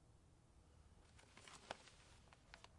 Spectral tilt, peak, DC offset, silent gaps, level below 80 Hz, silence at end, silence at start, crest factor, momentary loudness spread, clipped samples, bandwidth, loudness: -3 dB/octave; -30 dBFS; under 0.1%; none; -74 dBFS; 0 s; 0 s; 34 dB; 12 LU; under 0.1%; 11 kHz; -61 LUFS